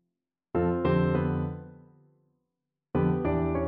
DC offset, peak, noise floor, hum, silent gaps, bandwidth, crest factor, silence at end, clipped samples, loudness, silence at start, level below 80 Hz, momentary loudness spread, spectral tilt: under 0.1%; -12 dBFS; -86 dBFS; none; none; 4.5 kHz; 16 dB; 0 s; under 0.1%; -28 LUFS; 0.55 s; -46 dBFS; 8 LU; -12 dB/octave